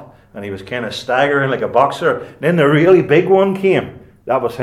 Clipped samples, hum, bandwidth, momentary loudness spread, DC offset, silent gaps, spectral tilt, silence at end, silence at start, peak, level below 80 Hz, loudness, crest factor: under 0.1%; none; 12.5 kHz; 17 LU; under 0.1%; none; -7 dB/octave; 0 s; 0 s; 0 dBFS; -54 dBFS; -15 LUFS; 14 dB